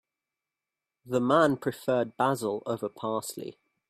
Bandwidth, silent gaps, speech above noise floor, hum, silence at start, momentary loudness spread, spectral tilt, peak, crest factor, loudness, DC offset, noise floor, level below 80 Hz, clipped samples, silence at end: 15.5 kHz; none; 61 dB; none; 1.05 s; 12 LU; -5.5 dB/octave; -10 dBFS; 20 dB; -28 LUFS; under 0.1%; -89 dBFS; -72 dBFS; under 0.1%; 0.4 s